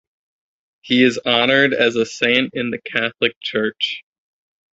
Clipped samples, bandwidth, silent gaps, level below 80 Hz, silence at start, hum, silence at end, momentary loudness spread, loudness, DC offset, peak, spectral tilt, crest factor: under 0.1%; 8 kHz; 3.36-3.41 s; -62 dBFS; 0.85 s; none; 0.75 s; 9 LU; -17 LUFS; under 0.1%; 0 dBFS; -4 dB/octave; 18 dB